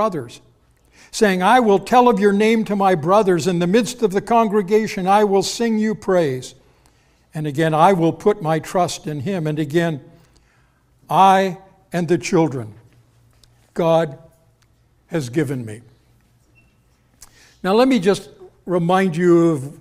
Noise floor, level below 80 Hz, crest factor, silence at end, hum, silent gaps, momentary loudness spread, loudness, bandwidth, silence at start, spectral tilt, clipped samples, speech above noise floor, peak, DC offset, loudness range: -58 dBFS; -54 dBFS; 18 dB; 0.05 s; none; none; 13 LU; -17 LUFS; 15.5 kHz; 0 s; -6 dB/octave; under 0.1%; 41 dB; -2 dBFS; under 0.1%; 8 LU